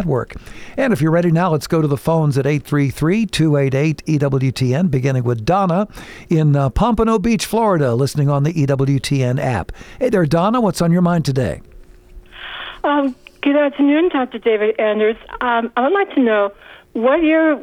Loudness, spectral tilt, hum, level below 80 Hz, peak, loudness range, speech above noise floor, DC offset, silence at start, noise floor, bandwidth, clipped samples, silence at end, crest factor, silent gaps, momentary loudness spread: -17 LUFS; -7 dB/octave; none; -38 dBFS; -4 dBFS; 2 LU; 24 dB; under 0.1%; 0 s; -40 dBFS; 16 kHz; under 0.1%; 0 s; 12 dB; none; 8 LU